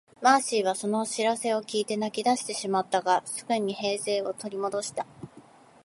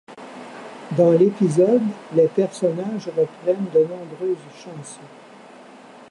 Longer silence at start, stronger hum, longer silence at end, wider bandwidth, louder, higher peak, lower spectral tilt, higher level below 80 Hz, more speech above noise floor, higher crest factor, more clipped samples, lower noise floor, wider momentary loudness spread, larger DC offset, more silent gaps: about the same, 0.2 s vs 0.1 s; neither; second, 0.45 s vs 1.05 s; about the same, 11.5 kHz vs 11.5 kHz; second, -27 LUFS vs -20 LUFS; about the same, -6 dBFS vs -4 dBFS; second, -3 dB/octave vs -7.5 dB/octave; about the same, -76 dBFS vs -74 dBFS; about the same, 26 dB vs 24 dB; about the same, 22 dB vs 18 dB; neither; first, -53 dBFS vs -44 dBFS; second, 10 LU vs 21 LU; neither; neither